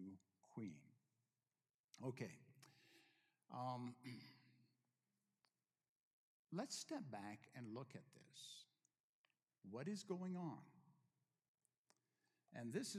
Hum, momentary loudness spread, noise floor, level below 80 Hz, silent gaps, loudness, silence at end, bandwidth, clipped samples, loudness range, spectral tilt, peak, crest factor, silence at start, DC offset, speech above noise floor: none; 16 LU; under -90 dBFS; under -90 dBFS; 1.74-1.88 s, 5.89-6.45 s, 9.00-9.24 s, 11.48-11.55 s, 11.78-11.85 s; -53 LUFS; 0 s; 14 kHz; under 0.1%; 3 LU; -5 dB/octave; -34 dBFS; 22 dB; 0 s; under 0.1%; over 38 dB